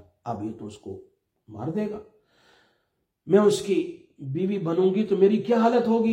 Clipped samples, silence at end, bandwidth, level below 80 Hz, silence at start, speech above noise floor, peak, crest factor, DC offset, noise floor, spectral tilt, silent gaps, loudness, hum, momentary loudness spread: under 0.1%; 0 s; 15.5 kHz; -68 dBFS; 0.25 s; 52 dB; -6 dBFS; 20 dB; under 0.1%; -75 dBFS; -7 dB/octave; none; -24 LUFS; none; 20 LU